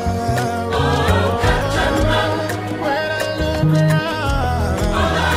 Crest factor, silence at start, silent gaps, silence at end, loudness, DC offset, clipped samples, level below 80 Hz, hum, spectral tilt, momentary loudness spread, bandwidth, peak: 14 dB; 0 s; none; 0 s; -18 LUFS; under 0.1%; under 0.1%; -26 dBFS; none; -5.5 dB/octave; 4 LU; 16 kHz; -4 dBFS